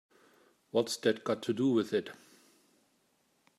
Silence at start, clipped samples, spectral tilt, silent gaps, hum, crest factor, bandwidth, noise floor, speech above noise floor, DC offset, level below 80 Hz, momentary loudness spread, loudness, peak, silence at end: 0.75 s; under 0.1%; -5 dB/octave; none; none; 20 dB; 14.5 kHz; -73 dBFS; 42 dB; under 0.1%; -84 dBFS; 6 LU; -32 LUFS; -16 dBFS; 1.45 s